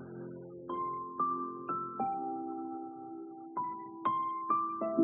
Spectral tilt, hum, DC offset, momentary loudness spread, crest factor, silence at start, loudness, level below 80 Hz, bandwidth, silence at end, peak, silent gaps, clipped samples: -4 dB/octave; none; under 0.1%; 13 LU; 20 dB; 0 s; -37 LUFS; -80 dBFS; 3.3 kHz; 0 s; -16 dBFS; none; under 0.1%